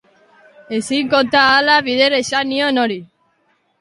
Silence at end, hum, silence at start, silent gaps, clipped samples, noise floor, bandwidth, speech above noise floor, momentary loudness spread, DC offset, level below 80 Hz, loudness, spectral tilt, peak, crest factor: 0.75 s; none; 0.7 s; none; under 0.1%; -62 dBFS; 11.5 kHz; 47 dB; 11 LU; under 0.1%; -58 dBFS; -15 LUFS; -3 dB/octave; 0 dBFS; 16 dB